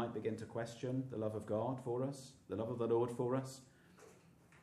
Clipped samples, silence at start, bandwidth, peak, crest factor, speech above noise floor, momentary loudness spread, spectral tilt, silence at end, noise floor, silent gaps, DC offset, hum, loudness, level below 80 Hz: under 0.1%; 0 s; 13.5 kHz; -26 dBFS; 16 dB; 25 dB; 10 LU; -7 dB/octave; 0 s; -65 dBFS; none; under 0.1%; none; -41 LUFS; -78 dBFS